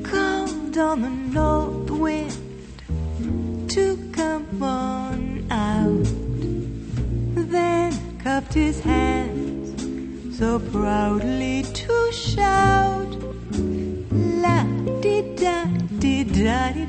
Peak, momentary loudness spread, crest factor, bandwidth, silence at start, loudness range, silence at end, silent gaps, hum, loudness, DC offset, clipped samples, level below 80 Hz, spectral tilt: -6 dBFS; 9 LU; 18 dB; 8.8 kHz; 0 s; 3 LU; 0 s; none; none; -23 LUFS; under 0.1%; under 0.1%; -34 dBFS; -6 dB/octave